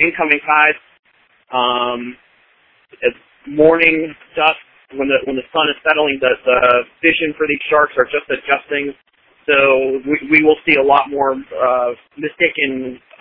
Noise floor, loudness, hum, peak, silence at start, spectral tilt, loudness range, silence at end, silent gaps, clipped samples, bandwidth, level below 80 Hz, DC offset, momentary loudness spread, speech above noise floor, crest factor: -55 dBFS; -15 LUFS; none; 0 dBFS; 0 s; -7.5 dB/octave; 3 LU; 0.25 s; 0.99-1.03 s; under 0.1%; 5 kHz; -52 dBFS; under 0.1%; 14 LU; 39 dB; 16 dB